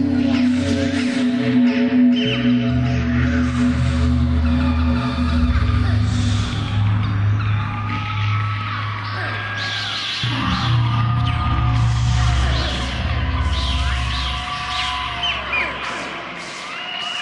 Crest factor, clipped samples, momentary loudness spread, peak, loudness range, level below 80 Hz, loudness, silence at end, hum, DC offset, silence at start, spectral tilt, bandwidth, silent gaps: 12 dB; under 0.1%; 6 LU; -6 dBFS; 4 LU; -28 dBFS; -19 LUFS; 0 s; none; under 0.1%; 0 s; -6 dB/octave; 11 kHz; none